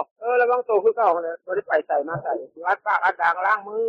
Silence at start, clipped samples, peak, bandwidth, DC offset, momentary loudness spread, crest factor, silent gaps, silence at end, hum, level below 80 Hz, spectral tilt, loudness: 0 s; under 0.1%; -8 dBFS; 6.4 kHz; under 0.1%; 8 LU; 14 dB; 0.11-0.16 s; 0 s; none; -72 dBFS; -6.5 dB/octave; -22 LUFS